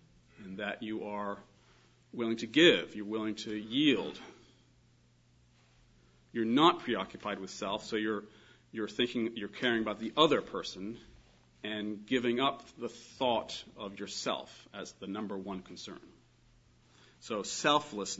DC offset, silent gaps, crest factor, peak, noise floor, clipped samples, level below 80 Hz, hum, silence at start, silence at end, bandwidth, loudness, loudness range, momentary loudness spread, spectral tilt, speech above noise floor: under 0.1%; none; 26 dB; -10 dBFS; -66 dBFS; under 0.1%; -70 dBFS; none; 0.4 s; 0 s; 7.6 kHz; -33 LUFS; 7 LU; 19 LU; -2.5 dB/octave; 33 dB